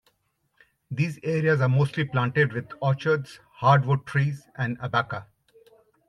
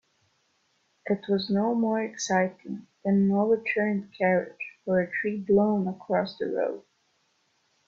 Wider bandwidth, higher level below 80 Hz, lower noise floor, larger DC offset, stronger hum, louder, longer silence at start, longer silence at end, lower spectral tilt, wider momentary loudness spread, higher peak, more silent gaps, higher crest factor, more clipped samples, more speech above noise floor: first, 10.5 kHz vs 7.6 kHz; about the same, -64 dBFS vs -68 dBFS; about the same, -72 dBFS vs -71 dBFS; neither; neither; about the same, -25 LUFS vs -27 LUFS; second, 0.9 s vs 1.05 s; second, 0.85 s vs 1.1 s; first, -7.5 dB/octave vs -6 dB/octave; about the same, 10 LU vs 10 LU; first, -6 dBFS vs -12 dBFS; neither; about the same, 18 dB vs 16 dB; neither; about the same, 48 dB vs 45 dB